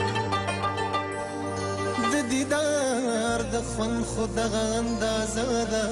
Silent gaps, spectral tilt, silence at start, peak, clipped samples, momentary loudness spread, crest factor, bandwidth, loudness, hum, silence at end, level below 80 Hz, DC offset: none; -4 dB/octave; 0 s; -16 dBFS; under 0.1%; 4 LU; 12 dB; 15 kHz; -27 LUFS; none; 0 s; -44 dBFS; under 0.1%